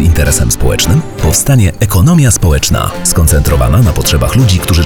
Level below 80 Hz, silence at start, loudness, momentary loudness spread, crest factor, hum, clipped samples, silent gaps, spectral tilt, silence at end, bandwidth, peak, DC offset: -18 dBFS; 0 s; -9 LUFS; 4 LU; 8 dB; none; under 0.1%; none; -4.5 dB/octave; 0 s; over 20 kHz; 0 dBFS; 3%